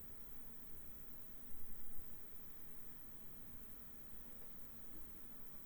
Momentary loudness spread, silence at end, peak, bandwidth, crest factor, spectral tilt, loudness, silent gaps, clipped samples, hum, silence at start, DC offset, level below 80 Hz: 1 LU; 0 s; -32 dBFS; over 20 kHz; 16 dB; -4.5 dB/octave; -51 LUFS; none; under 0.1%; none; 0 s; under 0.1%; -62 dBFS